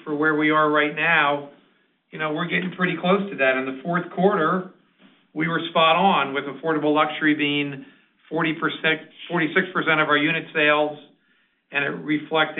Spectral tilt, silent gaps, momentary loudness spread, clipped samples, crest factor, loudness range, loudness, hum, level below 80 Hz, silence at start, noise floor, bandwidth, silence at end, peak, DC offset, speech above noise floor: -3 dB/octave; none; 10 LU; under 0.1%; 18 dB; 2 LU; -21 LUFS; none; -74 dBFS; 0.05 s; -65 dBFS; 4.2 kHz; 0 s; -4 dBFS; under 0.1%; 43 dB